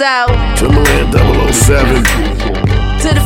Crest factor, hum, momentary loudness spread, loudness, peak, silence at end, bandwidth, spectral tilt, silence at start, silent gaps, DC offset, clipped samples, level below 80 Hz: 10 dB; none; 5 LU; -11 LUFS; 0 dBFS; 0 s; 17 kHz; -4.5 dB/octave; 0 s; none; under 0.1%; 0.3%; -14 dBFS